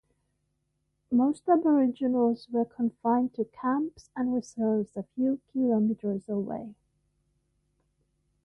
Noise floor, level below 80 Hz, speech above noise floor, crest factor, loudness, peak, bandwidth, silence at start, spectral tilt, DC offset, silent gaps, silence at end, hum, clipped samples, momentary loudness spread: -77 dBFS; -70 dBFS; 50 dB; 16 dB; -28 LUFS; -12 dBFS; 9.2 kHz; 1.1 s; -8 dB/octave; under 0.1%; none; 1.7 s; none; under 0.1%; 8 LU